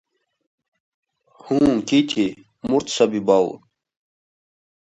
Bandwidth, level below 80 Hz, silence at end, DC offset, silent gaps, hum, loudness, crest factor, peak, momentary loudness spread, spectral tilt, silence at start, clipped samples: 8.4 kHz; -56 dBFS; 1.4 s; under 0.1%; none; none; -20 LUFS; 20 dB; -2 dBFS; 8 LU; -5 dB/octave; 1.45 s; under 0.1%